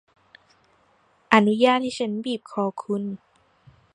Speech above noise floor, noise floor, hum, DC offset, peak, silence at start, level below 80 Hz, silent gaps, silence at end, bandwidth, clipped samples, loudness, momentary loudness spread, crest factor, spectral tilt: 39 dB; -62 dBFS; none; under 0.1%; 0 dBFS; 1.3 s; -68 dBFS; none; 0.8 s; 10.5 kHz; under 0.1%; -23 LUFS; 11 LU; 24 dB; -5.5 dB/octave